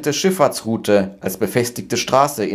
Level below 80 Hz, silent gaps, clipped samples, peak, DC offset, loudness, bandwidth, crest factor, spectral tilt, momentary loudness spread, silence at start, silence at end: -56 dBFS; none; under 0.1%; 0 dBFS; under 0.1%; -18 LUFS; 16 kHz; 18 dB; -4.5 dB/octave; 6 LU; 0 s; 0 s